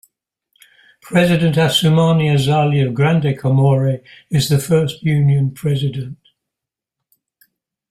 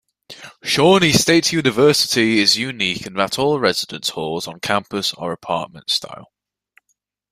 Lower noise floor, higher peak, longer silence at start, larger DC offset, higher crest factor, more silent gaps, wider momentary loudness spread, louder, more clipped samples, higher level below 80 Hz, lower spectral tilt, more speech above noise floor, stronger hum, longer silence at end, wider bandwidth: first, -84 dBFS vs -70 dBFS; about the same, -2 dBFS vs 0 dBFS; first, 1.05 s vs 0.3 s; neither; about the same, 14 dB vs 18 dB; neither; second, 7 LU vs 12 LU; about the same, -15 LUFS vs -17 LUFS; neither; about the same, -50 dBFS vs -54 dBFS; first, -6.5 dB/octave vs -3.5 dB/octave; first, 70 dB vs 52 dB; second, none vs 50 Hz at -50 dBFS; first, 1.75 s vs 1.05 s; about the same, 15 kHz vs 16 kHz